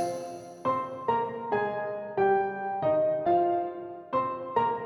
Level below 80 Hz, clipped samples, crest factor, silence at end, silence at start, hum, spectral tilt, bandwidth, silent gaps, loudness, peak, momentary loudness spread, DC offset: -68 dBFS; under 0.1%; 16 dB; 0 s; 0 s; none; -6.5 dB/octave; 12 kHz; none; -29 LUFS; -14 dBFS; 8 LU; under 0.1%